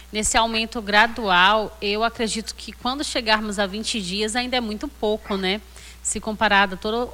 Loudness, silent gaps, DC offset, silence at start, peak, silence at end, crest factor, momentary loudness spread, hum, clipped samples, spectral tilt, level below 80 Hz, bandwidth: -21 LUFS; none; under 0.1%; 0 s; -4 dBFS; 0 s; 18 dB; 9 LU; none; under 0.1%; -2.5 dB/octave; -42 dBFS; 17 kHz